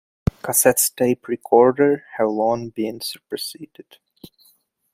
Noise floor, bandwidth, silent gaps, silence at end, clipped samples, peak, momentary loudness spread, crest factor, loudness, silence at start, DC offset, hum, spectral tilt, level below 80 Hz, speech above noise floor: -60 dBFS; 16 kHz; none; 1.3 s; under 0.1%; -2 dBFS; 14 LU; 20 dB; -19 LUFS; 0.45 s; under 0.1%; none; -4 dB/octave; -46 dBFS; 40 dB